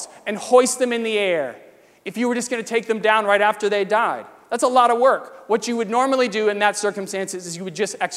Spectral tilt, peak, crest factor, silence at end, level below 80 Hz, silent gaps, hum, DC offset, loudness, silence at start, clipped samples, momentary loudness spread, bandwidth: -3 dB/octave; -2 dBFS; 18 dB; 0 s; -74 dBFS; none; none; under 0.1%; -20 LUFS; 0 s; under 0.1%; 12 LU; 15 kHz